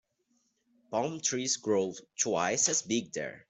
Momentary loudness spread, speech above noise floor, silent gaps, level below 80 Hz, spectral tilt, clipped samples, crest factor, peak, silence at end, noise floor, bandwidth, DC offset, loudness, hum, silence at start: 9 LU; 44 dB; none; -74 dBFS; -2.5 dB/octave; under 0.1%; 22 dB; -12 dBFS; 0.1 s; -75 dBFS; 8.4 kHz; under 0.1%; -30 LUFS; none; 0.9 s